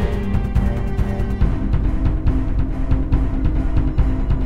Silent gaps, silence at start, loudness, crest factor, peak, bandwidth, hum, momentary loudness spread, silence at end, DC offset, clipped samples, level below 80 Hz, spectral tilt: none; 0 s; -21 LUFS; 14 dB; -4 dBFS; 5.2 kHz; none; 2 LU; 0 s; 4%; under 0.1%; -20 dBFS; -9 dB/octave